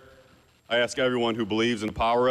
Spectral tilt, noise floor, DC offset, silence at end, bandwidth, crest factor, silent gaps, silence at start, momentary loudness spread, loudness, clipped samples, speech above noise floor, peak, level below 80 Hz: -4.5 dB/octave; -58 dBFS; under 0.1%; 0 s; 13 kHz; 10 dB; none; 0.7 s; 3 LU; -25 LUFS; under 0.1%; 33 dB; -16 dBFS; -50 dBFS